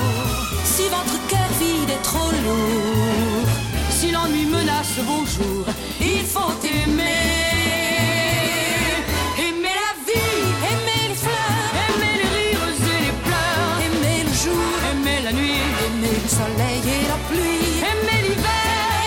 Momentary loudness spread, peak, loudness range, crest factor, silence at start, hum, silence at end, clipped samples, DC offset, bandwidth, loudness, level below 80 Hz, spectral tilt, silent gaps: 3 LU; -6 dBFS; 1 LU; 14 dB; 0 s; none; 0 s; under 0.1%; under 0.1%; 17 kHz; -20 LUFS; -32 dBFS; -4 dB/octave; none